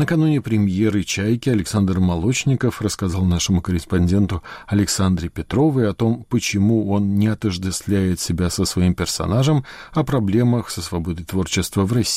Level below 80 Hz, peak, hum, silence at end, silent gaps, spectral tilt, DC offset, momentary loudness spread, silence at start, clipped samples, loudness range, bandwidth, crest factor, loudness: -38 dBFS; -8 dBFS; none; 0 s; none; -5.5 dB/octave; under 0.1%; 6 LU; 0 s; under 0.1%; 1 LU; 16 kHz; 12 dB; -20 LUFS